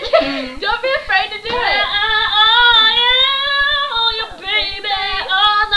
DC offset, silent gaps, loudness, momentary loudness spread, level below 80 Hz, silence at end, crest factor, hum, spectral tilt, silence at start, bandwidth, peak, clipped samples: 0.3%; none; -13 LUFS; 10 LU; -38 dBFS; 0 s; 14 dB; none; -2.5 dB/octave; 0 s; 11 kHz; 0 dBFS; under 0.1%